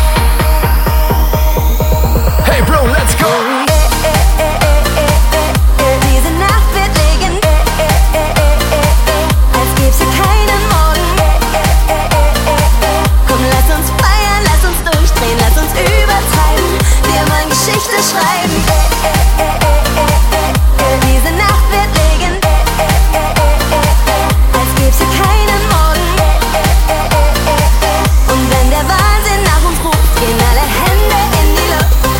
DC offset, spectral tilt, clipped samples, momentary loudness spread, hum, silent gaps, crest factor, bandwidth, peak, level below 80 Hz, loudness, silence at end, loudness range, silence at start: under 0.1%; -4.5 dB/octave; under 0.1%; 2 LU; none; none; 8 dB; 17 kHz; 0 dBFS; -12 dBFS; -11 LUFS; 0 s; 0 LU; 0 s